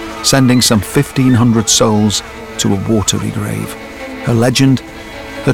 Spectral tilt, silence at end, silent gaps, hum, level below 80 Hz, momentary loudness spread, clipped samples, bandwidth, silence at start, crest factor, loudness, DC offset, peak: -4.5 dB/octave; 0 s; none; none; -38 dBFS; 16 LU; under 0.1%; 17.5 kHz; 0 s; 12 dB; -12 LUFS; 0.4%; 0 dBFS